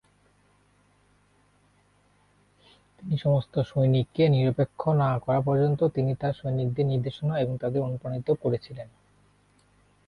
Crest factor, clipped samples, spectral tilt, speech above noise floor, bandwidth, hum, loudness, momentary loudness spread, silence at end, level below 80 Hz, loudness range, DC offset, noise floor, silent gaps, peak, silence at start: 16 dB; under 0.1%; -9.5 dB/octave; 39 dB; 5 kHz; 50 Hz at -45 dBFS; -26 LUFS; 8 LU; 1.2 s; -58 dBFS; 7 LU; under 0.1%; -64 dBFS; none; -12 dBFS; 3 s